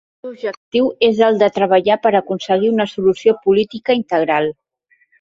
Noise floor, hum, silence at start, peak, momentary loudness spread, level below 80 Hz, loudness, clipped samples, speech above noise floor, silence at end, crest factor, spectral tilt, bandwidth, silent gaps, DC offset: -60 dBFS; none; 0.25 s; 0 dBFS; 9 LU; -60 dBFS; -16 LUFS; under 0.1%; 44 dB; 0.7 s; 16 dB; -6 dB/octave; 7.6 kHz; 0.57-0.72 s; under 0.1%